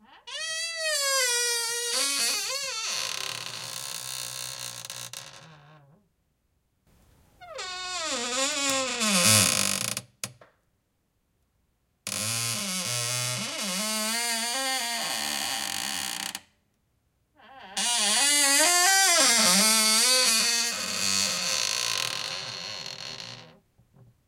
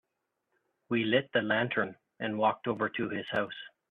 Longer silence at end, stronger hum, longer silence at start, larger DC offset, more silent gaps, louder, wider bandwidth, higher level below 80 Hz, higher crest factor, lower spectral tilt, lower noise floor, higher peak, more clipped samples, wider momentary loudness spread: first, 0.75 s vs 0.25 s; neither; second, 0.1 s vs 0.9 s; neither; neither; first, -24 LUFS vs -31 LUFS; first, 17 kHz vs 5.2 kHz; about the same, -70 dBFS vs -72 dBFS; about the same, 24 dB vs 20 dB; second, -0.5 dB/octave vs -8 dB/octave; second, -74 dBFS vs -83 dBFS; first, -4 dBFS vs -12 dBFS; neither; first, 17 LU vs 10 LU